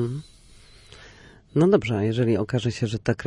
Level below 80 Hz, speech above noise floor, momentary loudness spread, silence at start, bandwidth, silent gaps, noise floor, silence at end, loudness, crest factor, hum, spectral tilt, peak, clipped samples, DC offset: -52 dBFS; 28 dB; 9 LU; 0 s; 11 kHz; none; -50 dBFS; 0 s; -23 LUFS; 20 dB; none; -7 dB/octave; -4 dBFS; under 0.1%; under 0.1%